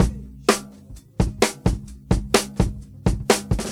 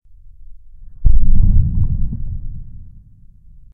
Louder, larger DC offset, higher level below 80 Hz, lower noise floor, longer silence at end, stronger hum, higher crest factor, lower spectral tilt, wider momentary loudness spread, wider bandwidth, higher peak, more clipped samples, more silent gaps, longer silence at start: second, -23 LUFS vs -20 LUFS; neither; second, -30 dBFS vs -16 dBFS; about the same, -43 dBFS vs -42 dBFS; second, 0 s vs 1.1 s; neither; first, 22 dB vs 14 dB; second, -4.5 dB/octave vs -14.5 dB/octave; second, 6 LU vs 20 LU; first, 17 kHz vs 0.5 kHz; about the same, 0 dBFS vs 0 dBFS; neither; neither; second, 0 s vs 0.5 s